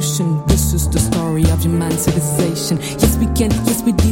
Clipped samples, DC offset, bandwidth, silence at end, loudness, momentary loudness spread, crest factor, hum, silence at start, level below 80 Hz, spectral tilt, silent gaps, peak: under 0.1%; under 0.1%; 17 kHz; 0 s; -16 LUFS; 2 LU; 14 dB; none; 0 s; -24 dBFS; -5.5 dB/octave; none; -2 dBFS